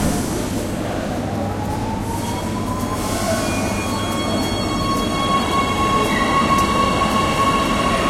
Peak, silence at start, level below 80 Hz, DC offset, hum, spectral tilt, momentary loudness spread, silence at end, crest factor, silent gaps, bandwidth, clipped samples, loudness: -4 dBFS; 0 s; -34 dBFS; under 0.1%; none; -4.5 dB/octave; 7 LU; 0 s; 16 dB; none; 16.5 kHz; under 0.1%; -19 LUFS